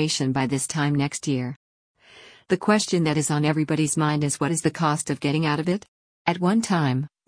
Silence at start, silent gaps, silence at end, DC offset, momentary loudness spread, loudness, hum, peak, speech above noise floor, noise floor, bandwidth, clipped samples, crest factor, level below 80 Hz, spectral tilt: 0 s; 1.56-1.95 s, 5.88-6.25 s; 0.2 s; under 0.1%; 6 LU; -23 LUFS; none; -6 dBFS; 27 dB; -50 dBFS; 10.5 kHz; under 0.1%; 16 dB; -60 dBFS; -5 dB/octave